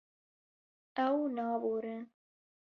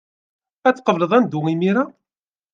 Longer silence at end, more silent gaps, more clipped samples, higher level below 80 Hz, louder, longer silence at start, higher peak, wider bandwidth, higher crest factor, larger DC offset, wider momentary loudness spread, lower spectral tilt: about the same, 0.65 s vs 0.65 s; neither; neither; second, -84 dBFS vs -70 dBFS; second, -35 LUFS vs -19 LUFS; first, 0.95 s vs 0.65 s; second, -20 dBFS vs -2 dBFS; second, 6.2 kHz vs 7.6 kHz; about the same, 18 dB vs 18 dB; neither; first, 13 LU vs 5 LU; second, -4 dB/octave vs -7.5 dB/octave